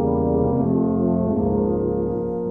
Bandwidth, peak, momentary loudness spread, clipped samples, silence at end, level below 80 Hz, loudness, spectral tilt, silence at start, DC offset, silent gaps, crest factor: 2.2 kHz; -8 dBFS; 4 LU; under 0.1%; 0 s; -38 dBFS; -21 LUFS; -14 dB/octave; 0 s; under 0.1%; none; 12 dB